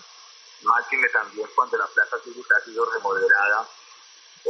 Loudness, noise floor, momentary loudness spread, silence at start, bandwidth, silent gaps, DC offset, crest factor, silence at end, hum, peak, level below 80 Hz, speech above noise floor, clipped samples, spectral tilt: -22 LUFS; -50 dBFS; 8 LU; 0.65 s; 8.6 kHz; none; under 0.1%; 18 dB; 0 s; none; -6 dBFS; under -90 dBFS; 27 dB; under 0.1%; -1.5 dB/octave